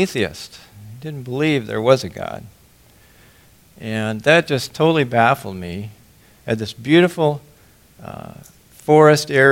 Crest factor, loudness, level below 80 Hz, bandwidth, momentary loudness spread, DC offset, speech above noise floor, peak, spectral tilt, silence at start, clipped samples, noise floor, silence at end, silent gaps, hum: 18 dB; -17 LUFS; -54 dBFS; 17 kHz; 22 LU; under 0.1%; 33 dB; 0 dBFS; -5.5 dB/octave; 0 s; under 0.1%; -50 dBFS; 0 s; none; none